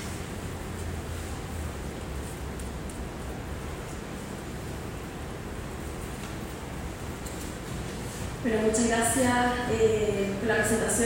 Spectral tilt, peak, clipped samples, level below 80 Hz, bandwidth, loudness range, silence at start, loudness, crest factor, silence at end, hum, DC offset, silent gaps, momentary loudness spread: -4.5 dB/octave; -12 dBFS; under 0.1%; -42 dBFS; 16.5 kHz; 11 LU; 0 s; -31 LUFS; 18 dB; 0 s; none; under 0.1%; none; 13 LU